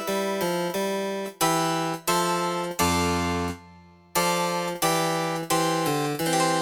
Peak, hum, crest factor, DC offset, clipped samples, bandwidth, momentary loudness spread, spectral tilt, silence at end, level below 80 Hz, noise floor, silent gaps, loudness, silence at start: -8 dBFS; none; 16 dB; under 0.1%; under 0.1%; 19.5 kHz; 5 LU; -3.5 dB/octave; 0 s; -52 dBFS; -51 dBFS; none; -25 LUFS; 0 s